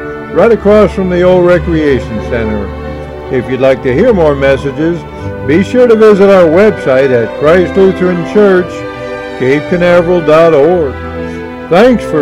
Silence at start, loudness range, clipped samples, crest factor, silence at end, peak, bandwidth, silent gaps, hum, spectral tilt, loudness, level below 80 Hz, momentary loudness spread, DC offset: 0 s; 4 LU; 4%; 8 dB; 0 s; 0 dBFS; 11.5 kHz; none; none; -7.5 dB/octave; -8 LUFS; -30 dBFS; 15 LU; under 0.1%